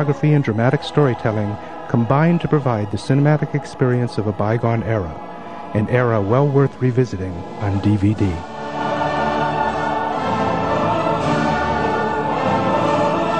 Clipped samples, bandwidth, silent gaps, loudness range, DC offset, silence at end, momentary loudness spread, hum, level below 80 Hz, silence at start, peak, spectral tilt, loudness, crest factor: under 0.1%; 9.4 kHz; none; 2 LU; 1%; 0 s; 8 LU; none; -40 dBFS; 0 s; 0 dBFS; -7.5 dB/octave; -19 LUFS; 18 dB